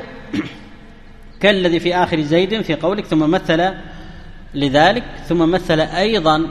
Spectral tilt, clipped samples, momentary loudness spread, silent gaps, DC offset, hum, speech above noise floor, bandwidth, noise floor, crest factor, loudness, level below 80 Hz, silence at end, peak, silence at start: -6 dB/octave; under 0.1%; 12 LU; none; under 0.1%; none; 23 dB; 12 kHz; -38 dBFS; 18 dB; -16 LUFS; -36 dBFS; 0 s; 0 dBFS; 0 s